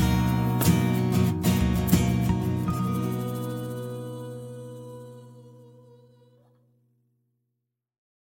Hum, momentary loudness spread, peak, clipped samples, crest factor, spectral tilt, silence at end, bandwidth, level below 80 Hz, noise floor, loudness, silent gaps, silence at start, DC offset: none; 18 LU; -6 dBFS; under 0.1%; 20 dB; -6.5 dB/octave; 2.55 s; 17 kHz; -40 dBFS; -82 dBFS; -25 LUFS; none; 0 s; under 0.1%